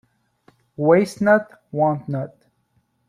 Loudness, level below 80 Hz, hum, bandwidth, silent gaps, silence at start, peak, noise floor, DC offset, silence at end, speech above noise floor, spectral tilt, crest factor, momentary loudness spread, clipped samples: -20 LUFS; -62 dBFS; none; 14 kHz; none; 0.8 s; -2 dBFS; -67 dBFS; under 0.1%; 0.8 s; 48 dB; -7.5 dB/octave; 18 dB; 13 LU; under 0.1%